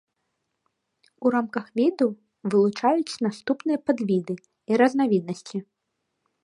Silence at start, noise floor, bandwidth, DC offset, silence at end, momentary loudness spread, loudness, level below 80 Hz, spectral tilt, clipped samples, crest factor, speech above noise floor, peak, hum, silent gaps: 1.2 s; -79 dBFS; 11 kHz; under 0.1%; 0.8 s; 13 LU; -24 LUFS; -74 dBFS; -6.5 dB/octave; under 0.1%; 20 dB; 55 dB; -6 dBFS; none; none